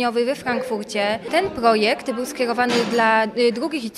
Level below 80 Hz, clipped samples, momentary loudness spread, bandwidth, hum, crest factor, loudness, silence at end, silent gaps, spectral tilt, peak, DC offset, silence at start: -56 dBFS; under 0.1%; 7 LU; 15 kHz; none; 18 dB; -20 LUFS; 0 s; none; -4 dB/octave; -4 dBFS; under 0.1%; 0 s